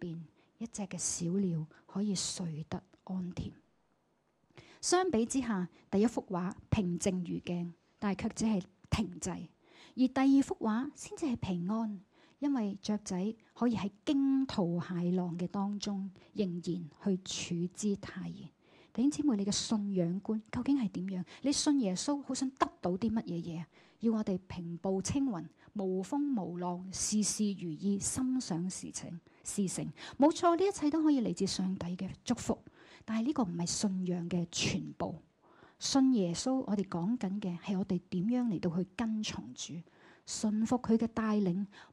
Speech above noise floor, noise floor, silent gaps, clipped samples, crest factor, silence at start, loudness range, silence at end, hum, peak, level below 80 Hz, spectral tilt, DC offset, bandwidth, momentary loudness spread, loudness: 41 dB; -75 dBFS; none; under 0.1%; 18 dB; 0 s; 4 LU; 0.05 s; none; -16 dBFS; -62 dBFS; -5 dB/octave; under 0.1%; 12.5 kHz; 12 LU; -34 LUFS